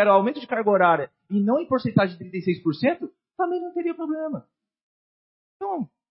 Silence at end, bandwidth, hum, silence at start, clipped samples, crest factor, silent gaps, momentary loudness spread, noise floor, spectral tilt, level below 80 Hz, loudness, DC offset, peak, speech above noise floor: 0.25 s; 5.8 kHz; none; 0 s; under 0.1%; 20 dB; 4.83-5.60 s; 13 LU; under -90 dBFS; -11.5 dB/octave; -68 dBFS; -24 LUFS; under 0.1%; -4 dBFS; over 67 dB